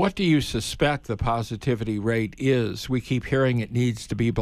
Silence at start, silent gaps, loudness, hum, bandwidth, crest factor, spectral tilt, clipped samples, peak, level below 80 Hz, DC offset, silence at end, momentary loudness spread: 0 s; none; -25 LUFS; none; 14 kHz; 16 dB; -6 dB/octave; under 0.1%; -8 dBFS; -42 dBFS; under 0.1%; 0 s; 5 LU